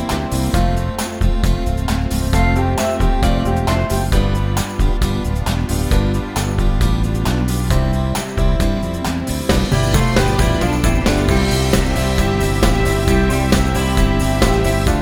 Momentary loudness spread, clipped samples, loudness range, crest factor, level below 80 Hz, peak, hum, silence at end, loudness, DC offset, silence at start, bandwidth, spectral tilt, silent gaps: 5 LU; under 0.1%; 3 LU; 14 dB; -20 dBFS; -2 dBFS; none; 0 s; -17 LUFS; under 0.1%; 0 s; 17.5 kHz; -5.5 dB/octave; none